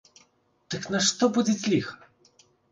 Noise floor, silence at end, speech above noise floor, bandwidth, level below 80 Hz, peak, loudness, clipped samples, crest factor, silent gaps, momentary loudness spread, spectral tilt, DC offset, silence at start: -64 dBFS; 0.75 s; 39 dB; 9.8 kHz; -66 dBFS; -8 dBFS; -25 LUFS; under 0.1%; 20 dB; none; 14 LU; -3.5 dB/octave; under 0.1%; 0.7 s